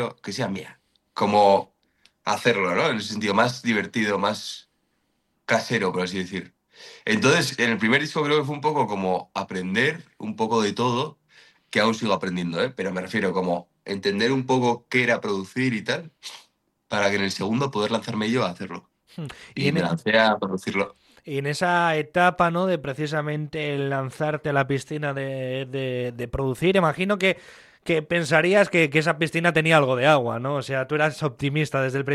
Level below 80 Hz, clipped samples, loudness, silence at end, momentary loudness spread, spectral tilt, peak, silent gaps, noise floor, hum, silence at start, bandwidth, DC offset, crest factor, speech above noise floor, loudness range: -58 dBFS; under 0.1%; -23 LUFS; 0 s; 12 LU; -5 dB/octave; -2 dBFS; none; -72 dBFS; none; 0 s; 13 kHz; under 0.1%; 20 dB; 48 dB; 5 LU